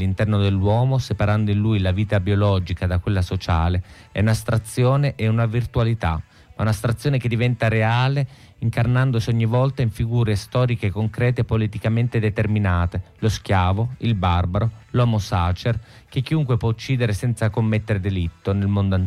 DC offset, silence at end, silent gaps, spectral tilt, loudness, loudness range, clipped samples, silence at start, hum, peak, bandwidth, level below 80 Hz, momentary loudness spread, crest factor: under 0.1%; 0 s; none; -7 dB/octave; -21 LUFS; 1 LU; under 0.1%; 0 s; none; -8 dBFS; 13 kHz; -38 dBFS; 5 LU; 12 dB